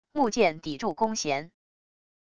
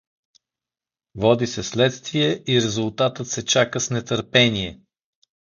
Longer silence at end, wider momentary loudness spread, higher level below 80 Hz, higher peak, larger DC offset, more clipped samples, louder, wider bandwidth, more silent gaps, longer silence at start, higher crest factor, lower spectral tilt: about the same, 0.7 s vs 0.7 s; about the same, 8 LU vs 8 LU; second, -62 dBFS vs -52 dBFS; second, -10 dBFS vs -2 dBFS; neither; neither; second, -27 LUFS vs -21 LUFS; first, 10.5 kHz vs 7.6 kHz; neither; second, 0.05 s vs 1.15 s; about the same, 20 dB vs 20 dB; about the same, -3.5 dB/octave vs -4 dB/octave